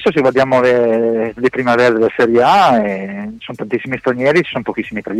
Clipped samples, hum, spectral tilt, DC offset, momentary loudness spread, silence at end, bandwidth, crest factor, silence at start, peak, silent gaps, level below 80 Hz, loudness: under 0.1%; none; -6 dB/octave; under 0.1%; 12 LU; 0 s; 12.5 kHz; 10 dB; 0 s; -4 dBFS; none; -50 dBFS; -14 LUFS